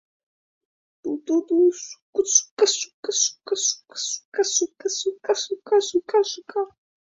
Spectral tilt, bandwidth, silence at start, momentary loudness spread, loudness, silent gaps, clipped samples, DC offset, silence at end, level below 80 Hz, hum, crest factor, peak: 0 dB/octave; 7.8 kHz; 1.05 s; 10 LU; -23 LUFS; 2.02-2.13 s, 2.51-2.57 s, 2.94-3.03 s, 4.25-4.32 s; under 0.1%; under 0.1%; 0.4 s; -74 dBFS; none; 20 dB; -4 dBFS